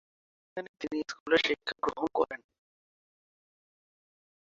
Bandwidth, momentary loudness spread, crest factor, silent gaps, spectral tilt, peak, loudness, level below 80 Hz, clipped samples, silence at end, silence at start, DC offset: 7.6 kHz; 16 LU; 24 dB; 0.69-0.74 s, 1.20-1.26 s; -0.5 dB/octave; -12 dBFS; -31 LUFS; -68 dBFS; under 0.1%; 2.15 s; 0.55 s; under 0.1%